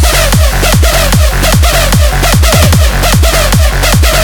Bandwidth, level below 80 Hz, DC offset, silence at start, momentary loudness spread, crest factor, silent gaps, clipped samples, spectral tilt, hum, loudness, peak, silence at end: over 20 kHz; -10 dBFS; under 0.1%; 0 s; 2 LU; 6 dB; none; 0.8%; -4 dB/octave; none; -7 LUFS; 0 dBFS; 0 s